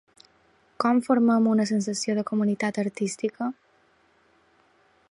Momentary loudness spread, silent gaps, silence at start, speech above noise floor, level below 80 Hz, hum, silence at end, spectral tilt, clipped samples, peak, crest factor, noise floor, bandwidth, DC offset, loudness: 9 LU; none; 0.8 s; 39 dB; -74 dBFS; none; 1.6 s; -5.5 dB/octave; under 0.1%; -8 dBFS; 18 dB; -63 dBFS; 11.5 kHz; under 0.1%; -25 LUFS